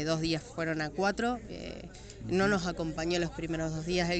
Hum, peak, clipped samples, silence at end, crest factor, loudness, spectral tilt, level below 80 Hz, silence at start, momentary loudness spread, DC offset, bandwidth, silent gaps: none; -16 dBFS; under 0.1%; 0 s; 16 dB; -32 LUFS; -5 dB/octave; -50 dBFS; 0 s; 13 LU; under 0.1%; 9 kHz; none